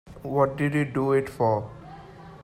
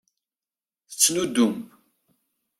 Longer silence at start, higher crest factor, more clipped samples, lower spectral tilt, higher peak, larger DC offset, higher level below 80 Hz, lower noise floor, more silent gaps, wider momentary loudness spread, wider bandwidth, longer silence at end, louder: second, 0.05 s vs 0.9 s; second, 18 dB vs 26 dB; neither; first, -8 dB/octave vs -2.5 dB/octave; second, -8 dBFS vs -2 dBFS; neither; first, -54 dBFS vs -68 dBFS; second, -45 dBFS vs under -90 dBFS; neither; first, 21 LU vs 17 LU; second, 14 kHz vs 16 kHz; second, 0 s vs 0.95 s; second, -25 LUFS vs -21 LUFS